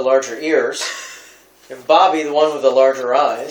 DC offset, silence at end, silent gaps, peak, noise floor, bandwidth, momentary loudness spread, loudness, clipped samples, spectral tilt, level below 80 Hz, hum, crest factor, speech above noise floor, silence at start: under 0.1%; 0 s; none; 0 dBFS; -45 dBFS; 19.5 kHz; 13 LU; -16 LUFS; under 0.1%; -2.5 dB/octave; -70 dBFS; none; 16 dB; 30 dB; 0 s